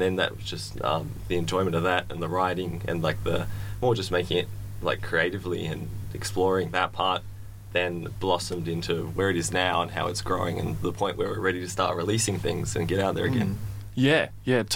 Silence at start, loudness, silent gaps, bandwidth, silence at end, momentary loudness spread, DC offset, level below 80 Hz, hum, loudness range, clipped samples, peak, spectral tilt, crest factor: 0 s; -27 LUFS; none; 17 kHz; 0 s; 7 LU; under 0.1%; -46 dBFS; none; 1 LU; under 0.1%; -8 dBFS; -4.5 dB/octave; 20 dB